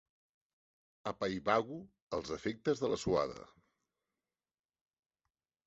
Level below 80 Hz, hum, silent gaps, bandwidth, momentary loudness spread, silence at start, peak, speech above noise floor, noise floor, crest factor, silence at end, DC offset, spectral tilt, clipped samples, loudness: -64 dBFS; none; 2.02-2.07 s; 8 kHz; 12 LU; 1.05 s; -14 dBFS; over 54 dB; under -90 dBFS; 26 dB; 2.2 s; under 0.1%; -4.5 dB/octave; under 0.1%; -37 LUFS